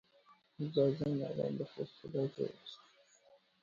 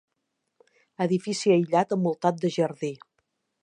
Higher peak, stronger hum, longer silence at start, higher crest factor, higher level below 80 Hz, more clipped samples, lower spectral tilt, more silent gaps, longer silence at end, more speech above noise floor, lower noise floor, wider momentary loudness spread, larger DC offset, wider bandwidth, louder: second, -20 dBFS vs -8 dBFS; neither; second, 0.3 s vs 1 s; about the same, 20 dB vs 20 dB; about the same, -74 dBFS vs -76 dBFS; neither; first, -7.5 dB/octave vs -6 dB/octave; neither; first, 0.85 s vs 0.65 s; second, 30 dB vs 55 dB; second, -68 dBFS vs -79 dBFS; first, 16 LU vs 11 LU; neither; second, 7.2 kHz vs 10.5 kHz; second, -38 LUFS vs -25 LUFS